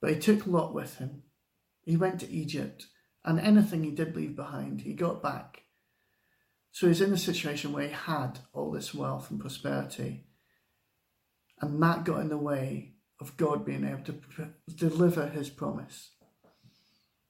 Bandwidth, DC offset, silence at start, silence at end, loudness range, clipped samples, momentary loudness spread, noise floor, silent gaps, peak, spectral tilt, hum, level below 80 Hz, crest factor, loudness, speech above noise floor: 16.5 kHz; under 0.1%; 0 s; 1.25 s; 6 LU; under 0.1%; 16 LU; -79 dBFS; none; -10 dBFS; -6.5 dB/octave; none; -68 dBFS; 20 dB; -31 LUFS; 48 dB